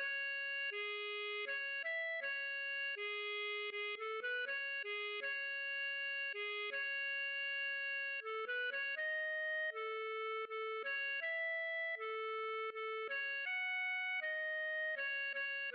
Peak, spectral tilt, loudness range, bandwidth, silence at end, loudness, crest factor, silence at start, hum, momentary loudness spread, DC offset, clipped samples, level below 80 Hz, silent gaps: -32 dBFS; 6.5 dB/octave; 1 LU; 5.4 kHz; 0 s; -39 LUFS; 8 dB; 0 s; none; 3 LU; under 0.1%; under 0.1%; under -90 dBFS; none